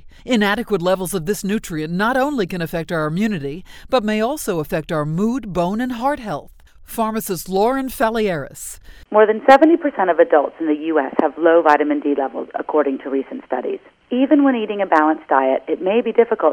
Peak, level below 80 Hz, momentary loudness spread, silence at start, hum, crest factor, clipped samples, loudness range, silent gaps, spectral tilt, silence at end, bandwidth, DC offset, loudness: 0 dBFS; -46 dBFS; 11 LU; 0.05 s; none; 18 dB; under 0.1%; 6 LU; none; -5.5 dB/octave; 0 s; over 20 kHz; under 0.1%; -18 LUFS